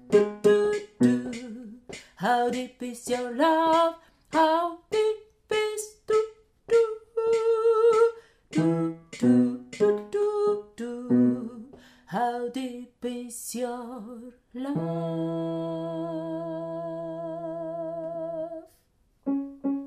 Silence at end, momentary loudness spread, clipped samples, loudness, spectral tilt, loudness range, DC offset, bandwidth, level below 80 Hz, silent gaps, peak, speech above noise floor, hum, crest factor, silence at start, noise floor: 0 s; 15 LU; under 0.1%; -27 LUFS; -6 dB/octave; 9 LU; under 0.1%; 15 kHz; -66 dBFS; none; -8 dBFS; 42 dB; none; 18 dB; 0.05 s; -66 dBFS